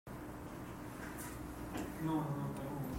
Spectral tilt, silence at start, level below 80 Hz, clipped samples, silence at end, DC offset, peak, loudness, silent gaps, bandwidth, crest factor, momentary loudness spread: -6.5 dB/octave; 0.05 s; -58 dBFS; under 0.1%; 0 s; under 0.1%; -26 dBFS; -43 LUFS; none; 16 kHz; 16 dB; 10 LU